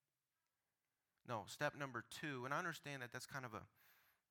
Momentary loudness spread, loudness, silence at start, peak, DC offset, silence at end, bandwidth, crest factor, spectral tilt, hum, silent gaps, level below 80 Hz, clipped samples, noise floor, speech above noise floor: 10 LU; -48 LUFS; 1.25 s; -26 dBFS; under 0.1%; 0.35 s; 19 kHz; 24 dB; -4 dB/octave; none; none; -88 dBFS; under 0.1%; under -90 dBFS; over 42 dB